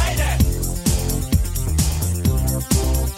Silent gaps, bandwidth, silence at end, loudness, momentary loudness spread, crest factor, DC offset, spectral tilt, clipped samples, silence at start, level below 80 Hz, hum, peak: none; 16.5 kHz; 0 s; -20 LUFS; 3 LU; 16 dB; under 0.1%; -5 dB/octave; under 0.1%; 0 s; -22 dBFS; none; -4 dBFS